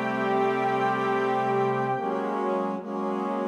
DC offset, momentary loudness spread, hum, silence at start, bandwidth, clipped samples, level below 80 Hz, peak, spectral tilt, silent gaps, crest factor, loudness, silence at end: under 0.1%; 4 LU; none; 0 s; 10 kHz; under 0.1%; -76 dBFS; -12 dBFS; -7 dB/octave; none; 14 dB; -26 LUFS; 0 s